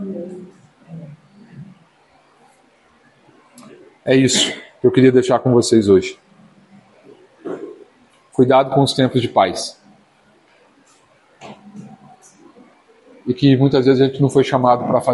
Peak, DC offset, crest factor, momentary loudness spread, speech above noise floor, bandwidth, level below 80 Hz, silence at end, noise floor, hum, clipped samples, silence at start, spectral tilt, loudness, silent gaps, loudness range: 0 dBFS; under 0.1%; 18 dB; 24 LU; 40 dB; 11.5 kHz; -56 dBFS; 0 s; -54 dBFS; none; under 0.1%; 0 s; -5.5 dB/octave; -15 LUFS; none; 10 LU